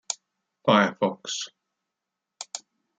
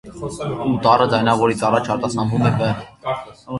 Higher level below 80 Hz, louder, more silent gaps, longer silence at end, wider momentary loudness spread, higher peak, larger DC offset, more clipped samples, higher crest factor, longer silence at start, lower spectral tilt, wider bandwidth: second, -76 dBFS vs -48 dBFS; second, -25 LUFS vs -19 LUFS; neither; first, 0.4 s vs 0 s; first, 18 LU vs 12 LU; second, -6 dBFS vs 0 dBFS; neither; neither; about the same, 22 dB vs 18 dB; about the same, 0.1 s vs 0.05 s; second, -3.5 dB/octave vs -6.5 dB/octave; second, 9.6 kHz vs 11.5 kHz